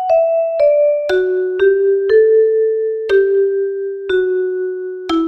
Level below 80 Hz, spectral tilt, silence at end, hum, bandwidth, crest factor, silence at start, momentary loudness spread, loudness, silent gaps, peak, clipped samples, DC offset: -52 dBFS; -5 dB/octave; 0 s; none; 6.2 kHz; 12 dB; 0 s; 8 LU; -15 LUFS; none; -2 dBFS; under 0.1%; under 0.1%